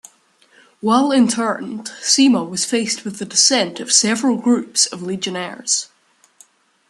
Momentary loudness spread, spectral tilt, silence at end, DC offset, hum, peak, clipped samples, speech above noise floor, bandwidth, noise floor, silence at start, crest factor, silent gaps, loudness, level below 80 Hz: 11 LU; -2 dB/octave; 1.05 s; under 0.1%; none; 0 dBFS; under 0.1%; 37 dB; 12.5 kHz; -55 dBFS; 0.85 s; 18 dB; none; -17 LUFS; -68 dBFS